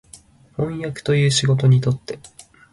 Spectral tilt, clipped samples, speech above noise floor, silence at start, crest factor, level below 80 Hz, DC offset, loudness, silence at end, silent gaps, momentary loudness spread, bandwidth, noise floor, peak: -5.5 dB/octave; under 0.1%; 29 dB; 0.15 s; 16 dB; -50 dBFS; under 0.1%; -19 LUFS; 0.45 s; none; 18 LU; 11.5 kHz; -48 dBFS; -4 dBFS